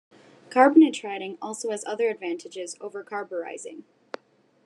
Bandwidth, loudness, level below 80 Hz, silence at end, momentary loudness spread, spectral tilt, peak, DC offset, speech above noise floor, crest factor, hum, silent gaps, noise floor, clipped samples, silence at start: 11 kHz; -24 LUFS; -88 dBFS; 0.85 s; 24 LU; -3.5 dB/octave; -6 dBFS; under 0.1%; 37 dB; 20 dB; none; none; -61 dBFS; under 0.1%; 0.5 s